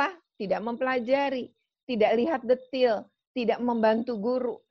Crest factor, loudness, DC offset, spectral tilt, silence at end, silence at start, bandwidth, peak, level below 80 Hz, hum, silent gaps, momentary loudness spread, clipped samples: 16 dB; -27 LUFS; under 0.1%; -7 dB/octave; 0.15 s; 0 s; 6.2 kHz; -10 dBFS; -70 dBFS; none; 1.83-1.87 s, 3.27-3.34 s; 10 LU; under 0.1%